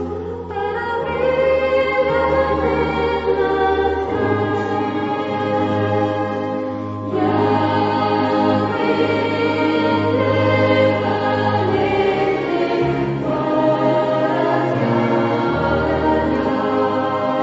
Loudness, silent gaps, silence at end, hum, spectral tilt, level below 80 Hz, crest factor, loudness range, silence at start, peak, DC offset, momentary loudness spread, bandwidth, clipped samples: -18 LUFS; none; 0 s; none; -7.5 dB/octave; -40 dBFS; 14 dB; 2 LU; 0 s; -2 dBFS; under 0.1%; 5 LU; 7.8 kHz; under 0.1%